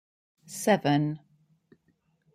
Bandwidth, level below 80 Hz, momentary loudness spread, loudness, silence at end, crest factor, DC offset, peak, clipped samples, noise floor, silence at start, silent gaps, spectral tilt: 15.5 kHz; -72 dBFS; 18 LU; -26 LUFS; 1.15 s; 20 dB; under 0.1%; -10 dBFS; under 0.1%; -71 dBFS; 0.5 s; none; -5.5 dB/octave